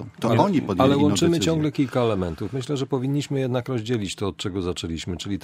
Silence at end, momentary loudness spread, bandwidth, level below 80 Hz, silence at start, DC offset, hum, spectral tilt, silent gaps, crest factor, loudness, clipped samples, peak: 0.05 s; 9 LU; 15.5 kHz; -50 dBFS; 0 s; under 0.1%; none; -6 dB/octave; none; 18 dB; -23 LUFS; under 0.1%; -4 dBFS